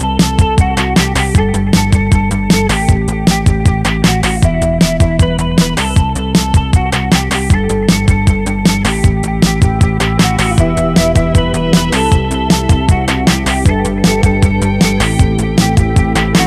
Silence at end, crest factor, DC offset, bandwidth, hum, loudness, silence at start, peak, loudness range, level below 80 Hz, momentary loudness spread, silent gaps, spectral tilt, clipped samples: 0 s; 10 dB; under 0.1%; 14.5 kHz; none; -12 LUFS; 0 s; 0 dBFS; 1 LU; -18 dBFS; 2 LU; none; -5.5 dB/octave; under 0.1%